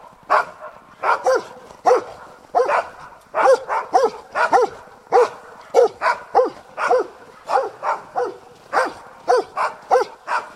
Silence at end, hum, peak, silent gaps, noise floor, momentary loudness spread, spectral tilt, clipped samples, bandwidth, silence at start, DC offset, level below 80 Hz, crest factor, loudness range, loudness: 0.05 s; none; -2 dBFS; none; -40 dBFS; 12 LU; -3 dB/octave; under 0.1%; 12.5 kHz; 0.3 s; under 0.1%; -64 dBFS; 18 dB; 4 LU; -20 LUFS